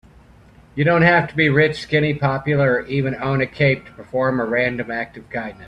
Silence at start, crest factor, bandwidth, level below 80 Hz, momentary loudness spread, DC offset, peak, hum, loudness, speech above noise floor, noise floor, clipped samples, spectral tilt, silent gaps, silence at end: 0.75 s; 18 dB; 9 kHz; -48 dBFS; 12 LU; under 0.1%; 0 dBFS; none; -19 LUFS; 29 dB; -48 dBFS; under 0.1%; -7.5 dB/octave; none; 0 s